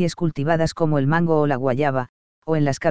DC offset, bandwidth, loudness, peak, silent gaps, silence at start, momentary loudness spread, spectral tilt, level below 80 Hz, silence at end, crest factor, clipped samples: 2%; 8 kHz; -21 LUFS; -4 dBFS; 2.09-2.42 s; 0 s; 7 LU; -7 dB/octave; -48 dBFS; 0 s; 16 dB; under 0.1%